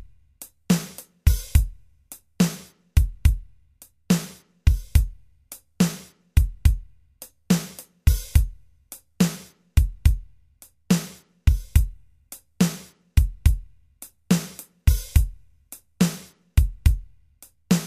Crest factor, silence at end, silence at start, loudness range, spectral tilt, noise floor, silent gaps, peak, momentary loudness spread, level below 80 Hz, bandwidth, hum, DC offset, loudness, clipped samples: 20 dB; 0 s; 0.4 s; 1 LU; -5.5 dB/octave; -54 dBFS; none; -4 dBFS; 22 LU; -26 dBFS; 15.5 kHz; none; under 0.1%; -24 LUFS; under 0.1%